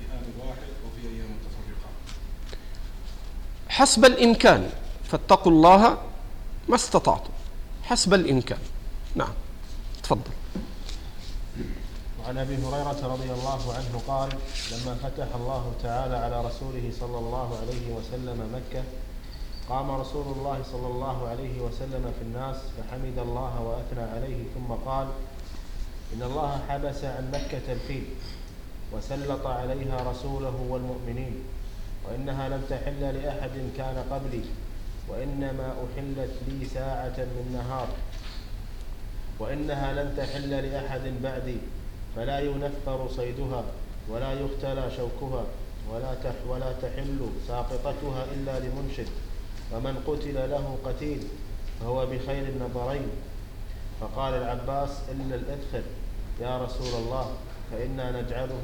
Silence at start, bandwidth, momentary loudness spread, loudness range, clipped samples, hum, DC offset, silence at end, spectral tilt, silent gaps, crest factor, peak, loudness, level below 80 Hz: 0 s; 19.5 kHz; 16 LU; 13 LU; under 0.1%; none; under 0.1%; 0 s; -5 dB/octave; none; 22 dB; -6 dBFS; -28 LUFS; -34 dBFS